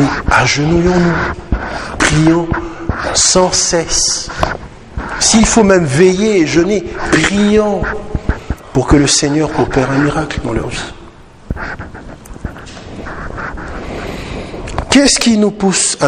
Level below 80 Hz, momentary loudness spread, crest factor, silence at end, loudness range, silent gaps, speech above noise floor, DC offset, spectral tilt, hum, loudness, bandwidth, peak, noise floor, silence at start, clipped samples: -26 dBFS; 17 LU; 14 dB; 0 s; 14 LU; none; 25 dB; under 0.1%; -4 dB/octave; none; -12 LUFS; 14 kHz; 0 dBFS; -36 dBFS; 0 s; 0.1%